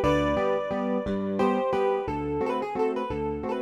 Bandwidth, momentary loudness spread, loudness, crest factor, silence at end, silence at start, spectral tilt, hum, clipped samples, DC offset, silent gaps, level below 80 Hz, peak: 12 kHz; 5 LU; -27 LUFS; 16 dB; 0 s; 0 s; -7 dB/octave; none; under 0.1%; under 0.1%; none; -44 dBFS; -10 dBFS